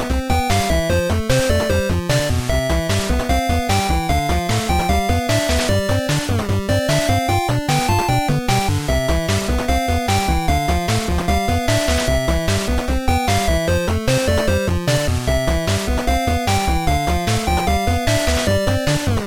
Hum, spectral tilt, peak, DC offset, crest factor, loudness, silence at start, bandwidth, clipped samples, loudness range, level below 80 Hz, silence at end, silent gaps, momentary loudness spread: none; -5 dB/octave; -2 dBFS; under 0.1%; 14 dB; -18 LUFS; 0 s; 19 kHz; under 0.1%; 1 LU; -24 dBFS; 0 s; none; 2 LU